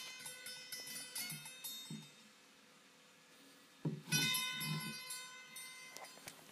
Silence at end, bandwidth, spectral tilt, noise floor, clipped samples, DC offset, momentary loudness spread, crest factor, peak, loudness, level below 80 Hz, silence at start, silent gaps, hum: 0 s; 15.5 kHz; -2 dB/octave; -65 dBFS; under 0.1%; under 0.1%; 27 LU; 24 dB; -22 dBFS; -43 LUFS; -90 dBFS; 0 s; none; none